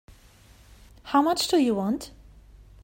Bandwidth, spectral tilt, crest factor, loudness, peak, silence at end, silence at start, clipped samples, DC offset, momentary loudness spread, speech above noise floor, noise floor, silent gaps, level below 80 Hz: 16.5 kHz; -4.5 dB/octave; 20 dB; -24 LUFS; -8 dBFS; 0.75 s; 1.05 s; under 0.1%; under 0.1%; 18 LU; 30 dB; -54 dBFS; none; -54 dBFS